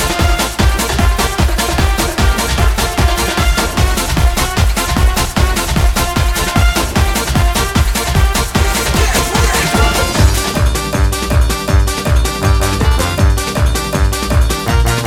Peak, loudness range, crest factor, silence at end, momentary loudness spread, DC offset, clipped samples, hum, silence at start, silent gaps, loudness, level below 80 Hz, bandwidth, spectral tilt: 0 dBFS; 1 LU; 12 dB; 0 s; 2 LU; under 0.1%; under 0.1%; none; 0 s; none; -13 LUFS; -16 dBFS; 17.5 kHz; -4 dB/octave